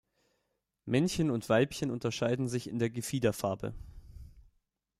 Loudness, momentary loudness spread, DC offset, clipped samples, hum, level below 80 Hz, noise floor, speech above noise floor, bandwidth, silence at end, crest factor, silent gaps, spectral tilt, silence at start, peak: -32 LUFS; 13 LU; under 0.1%; under 0.1%; none; -56 dBFS; -81 dBFS; 50 dB; 15.5 kHz; 0.6 s; 20 dB; none; -5.5 dB/octave; 0.85 s; -14 dBFS